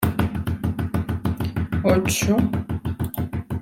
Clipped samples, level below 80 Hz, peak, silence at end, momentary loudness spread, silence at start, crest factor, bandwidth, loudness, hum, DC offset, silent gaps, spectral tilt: under 0.1%; -40 dBFS; -4 dBFS; 0 s; 8 LU; 0 s; 20 dB; 17 kHz; -24 LUFS; none; under 0.1%; none; -6 dB/octave